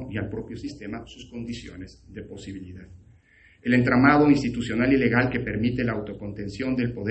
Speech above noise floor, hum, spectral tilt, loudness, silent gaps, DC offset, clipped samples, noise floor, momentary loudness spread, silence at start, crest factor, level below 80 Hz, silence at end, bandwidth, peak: 32 dB; none; -7.5 dB/octave; -23 LUFS; none; under 0.1%; under 0.1%; -56 dBFS; 22 LU; 0 s; 22 dB; -48 dBFS; 0 s; 8.6 kHz; -4 dBFS